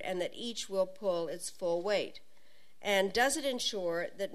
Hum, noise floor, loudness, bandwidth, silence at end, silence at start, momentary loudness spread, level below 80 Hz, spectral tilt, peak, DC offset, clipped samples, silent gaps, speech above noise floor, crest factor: none; -67 dBFS; -33 LUFS; 14 kHz; 0 s; 0 s; 9 LU; -68 dBFS; -2.5 dB/octave; -14 dBFS; 0.4%; under 0.1%; none; 34 dB; 20 dB